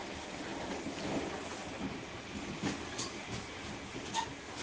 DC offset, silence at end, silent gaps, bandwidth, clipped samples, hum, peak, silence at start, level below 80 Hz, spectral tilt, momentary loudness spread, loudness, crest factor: under 0.1%; 0 s; none; 10 kHz; under 0.1%; none; -22 dBFS; 0 s; -60 dBFS; -3.5 dB/octave; 5 LU; -40 LUFS; 18 dB